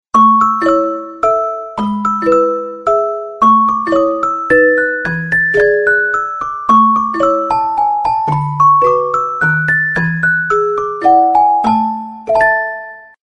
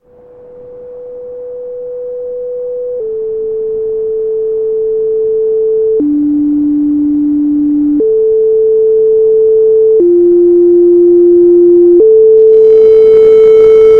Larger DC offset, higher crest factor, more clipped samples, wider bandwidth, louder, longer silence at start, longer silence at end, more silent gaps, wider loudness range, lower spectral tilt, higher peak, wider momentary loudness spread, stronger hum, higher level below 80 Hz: second, under 0.1% vs 0.5%; about the same, 12 dB vs 8 dB; second, under 0.1% vs 0.1%; first, 10 kHz vs 3.3 kHz; second, -12 LUFS vs -8 LUFS; second, 0.15 s vs 0.5 s; first, 0.2 s vs 0 s; neither; second, 2 LU vs 13 LU; second, -7 dB/octave vs -9 dB/octave; about the same, 0 dBFS vs 0 dBFS; second, 8 LU vs 16 LU; neither; about the same, -46 dBFS vs -44 dBFS